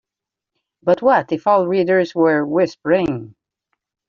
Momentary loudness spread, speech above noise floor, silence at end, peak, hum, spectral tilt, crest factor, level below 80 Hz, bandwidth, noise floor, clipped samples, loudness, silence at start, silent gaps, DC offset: 6 LU; 69 dB; 0.8 s; -2 dBFS; none; -5 dB/octave; 16 dB; -58 dBFS; 7.2 kHz; -86 dBFS; under 0.1%; -17 LUFS; 0.85 s; none; under 0.1%